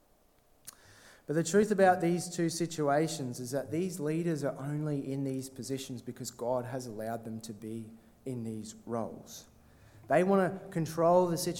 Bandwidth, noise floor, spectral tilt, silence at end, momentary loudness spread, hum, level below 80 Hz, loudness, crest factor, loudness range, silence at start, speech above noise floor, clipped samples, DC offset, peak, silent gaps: 17 kHz; -66 dBFS; -5.5 dB/octave; 0 s; 18 LU; none; -68 dBFS; -32 LUFS; 20 dB; 9 LU; 0.65 s; 35 dB; under 0.1%; under 0.1%; -12 dBFS; none